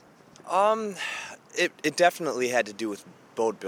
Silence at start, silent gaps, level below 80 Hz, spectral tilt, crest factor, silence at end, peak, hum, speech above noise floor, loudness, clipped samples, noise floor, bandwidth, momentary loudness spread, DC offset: 0.45 s; none; -80 dBFS; -3 dB/octave; 22 dB; 0 s; -6 dBFS; none; 23 dB; -27 LUFS; under 0.1%; -49 dBFS; 18 kHz; 12 LU; under 0.1%